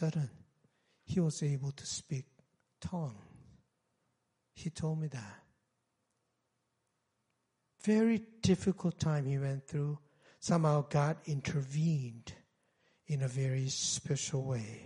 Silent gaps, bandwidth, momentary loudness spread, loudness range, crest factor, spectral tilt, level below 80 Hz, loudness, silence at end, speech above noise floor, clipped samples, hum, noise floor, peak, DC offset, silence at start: none; 11 kHz; 13 LU; 11 LU; 20 dB; -5.5 dB/octave; -66 dBFS; -35 LUFS; 0 s; 48 dB; under 0.1%; none; -82 dBFS; -16 dBFS; under 0.1%; 0 s